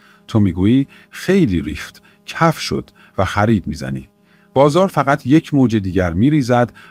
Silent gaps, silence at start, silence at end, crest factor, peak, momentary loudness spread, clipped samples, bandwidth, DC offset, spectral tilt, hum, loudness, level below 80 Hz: none; 0.3 s; 0.2 s; 16 dB; 0 dBFS; 13 LU; under 0.1%; 15.5 kHz; under 0.1%; -7 dB/octave; none; -16 LUFS; -44 dBFS